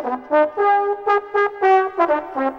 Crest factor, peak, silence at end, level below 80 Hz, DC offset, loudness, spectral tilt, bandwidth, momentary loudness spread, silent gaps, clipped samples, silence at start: 14 dB; -4 dBFS; 0 s; -60 dBFS; under 0.1%; -18 LUFS; -5 dB/octave; 6.8 kHz; 4 LU; none; under 0.1%; 0 s